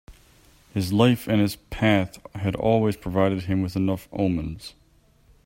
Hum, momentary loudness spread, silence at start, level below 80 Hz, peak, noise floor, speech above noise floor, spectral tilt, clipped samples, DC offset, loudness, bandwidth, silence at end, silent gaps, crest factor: none; 12 LU; 0.1 s; -48 dBFS; -4 dBFS; -58 dBFS; 35 dB; -7 dB/octave; under 0.1%; under 0.1%; -24 LUFS; 16.5 kHz; 0.75 s; none; 20 dB